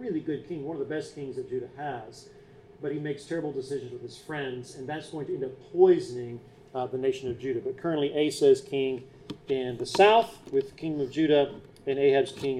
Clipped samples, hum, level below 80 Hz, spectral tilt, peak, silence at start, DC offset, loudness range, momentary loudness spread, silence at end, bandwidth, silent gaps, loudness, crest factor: under 0.1%; none; -64 dBFS; -5.5 dB/octave; -8 dBFS; 0 s; under 0.1%; 10 LU; 16 LU; 0 s; 12.5 kHz; none; -28 LUFS; 20 dB